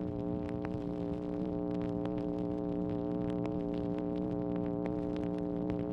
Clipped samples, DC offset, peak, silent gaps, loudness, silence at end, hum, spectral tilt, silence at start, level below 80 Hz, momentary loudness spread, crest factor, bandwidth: under 0.1%; under 0.1%; -20 dBFS; none; -36 LUFS; 0 s; none; -10 dB/octave; 0 s; -52 dBFS; 2 LU; 16 dB; 6 kHz